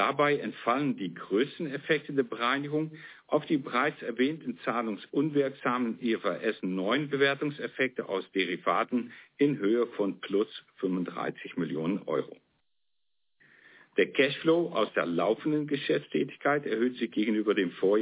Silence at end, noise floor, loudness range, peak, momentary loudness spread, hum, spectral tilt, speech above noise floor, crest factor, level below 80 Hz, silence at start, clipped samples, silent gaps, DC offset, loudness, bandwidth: 0 s; -85 dBFS; 4 LU; -12 dBFS; 7 LU; none; -4 dB/octave; 56 dB; 18 dB; -80 dBFS; 0 s; under 0.1%; none; under 0.1%; -30 LUFS; 4 kHz